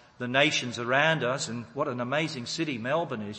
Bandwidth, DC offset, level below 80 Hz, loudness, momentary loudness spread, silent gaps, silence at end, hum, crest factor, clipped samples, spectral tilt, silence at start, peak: 8.8 kHz; under 0.1%; -70 dBFS; -27 LUFS; 9 LU; none; 0 s; none; 22 dB; under 0.1%; -4 dB/octave; 0.2 s; -8 dBFS